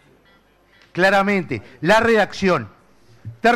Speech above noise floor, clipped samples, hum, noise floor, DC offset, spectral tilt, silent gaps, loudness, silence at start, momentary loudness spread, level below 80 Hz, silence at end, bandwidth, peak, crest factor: 38 dB; under 0.1%; none; -55 dBFS; under 0.1%; -5.5 dB/octave; none; -18 LUFS; 0.95 s; 14 LU; -50 dBFS; 0 s; 15.5 kHz; -6 dBFS; 14 dB